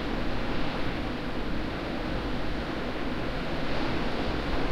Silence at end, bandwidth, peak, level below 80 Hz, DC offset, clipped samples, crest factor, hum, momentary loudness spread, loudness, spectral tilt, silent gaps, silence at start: 0 s; 10.5 kHz; -16 dBFS; -36 dBFS; under 0.1%; under 0.1%; 14 dB; none; 2 LU; -32 LUFS; -6.5 dB/octave; none; 0 s